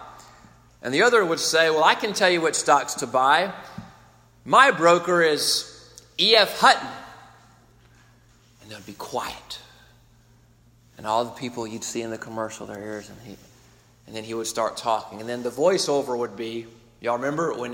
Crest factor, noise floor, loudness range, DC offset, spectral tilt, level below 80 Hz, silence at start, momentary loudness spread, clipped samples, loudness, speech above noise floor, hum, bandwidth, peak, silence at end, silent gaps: 22 dB; -56 dBFS; 14 LU; under 0.1%; -2.5 dB/octave; -62 dBFS; 0 s; 21 LU; under 0.1%; -21 LUFS; 34 dB; none; 16.5 kHz; -2 dBFS; 0 s; none